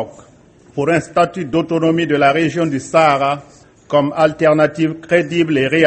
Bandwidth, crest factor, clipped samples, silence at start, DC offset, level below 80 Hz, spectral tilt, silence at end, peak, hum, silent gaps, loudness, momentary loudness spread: 8.8 kHz; 16 dB; under 0.1%; 0 s; under 0.1%; -52 dBFS; -6 dB/octave; 0 s; 0 dBFS; none; none; -15 LUFS; 7 LU